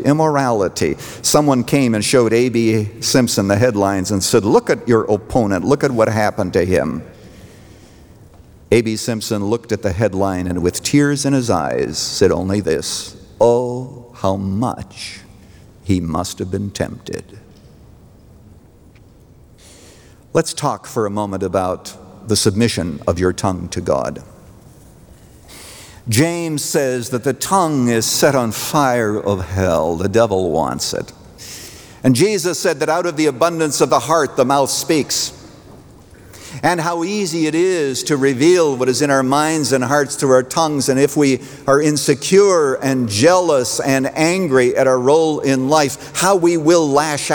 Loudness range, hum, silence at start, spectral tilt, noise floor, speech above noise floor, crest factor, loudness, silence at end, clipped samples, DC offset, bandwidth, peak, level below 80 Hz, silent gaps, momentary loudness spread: 8 LU; none; 0 s; -4.5 dB/octave; -45 dBFS; 29 dB; 16 dB; -16 LUFS; 0 s; under 0.1%; under 0.1%; over 20 kHz; -2 dBFS; -48 dBFS; none; 10 LU